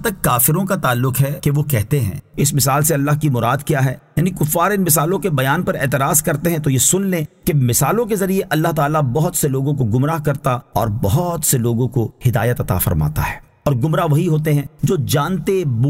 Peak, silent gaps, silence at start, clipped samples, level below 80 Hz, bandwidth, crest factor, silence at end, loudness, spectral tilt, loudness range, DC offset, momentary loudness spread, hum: -2 dBFS; none; 0 s; under 0.1%; -38 dBFS; 16.5 kHz; 16 dB; 0 s; -17 LUFS; -5 dB/octave; 2 LU; under 0.1%; 5 LU; none